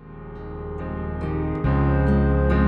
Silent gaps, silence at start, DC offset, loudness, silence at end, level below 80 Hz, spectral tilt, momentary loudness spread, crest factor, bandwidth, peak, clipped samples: none; 0 s; under 0.1%; -23 LUFS; 0 s; -26 dBFS; -10.5 dB/octave; 16 LU; 14 dB; 4.7 kHz; -8 dBFS; under 0.1%